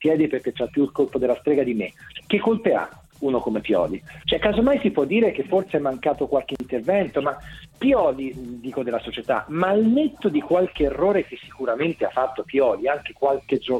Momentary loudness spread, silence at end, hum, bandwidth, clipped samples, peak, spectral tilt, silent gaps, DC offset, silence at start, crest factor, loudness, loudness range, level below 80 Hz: 9 LU; 0 s; none; 12.5 kHz; under 0.1%; -4 dBFS; -7 dB/octave; none; under 0.1%; 0 s; 18 dB; -22 LUFS; 2 LU; -48 dBFS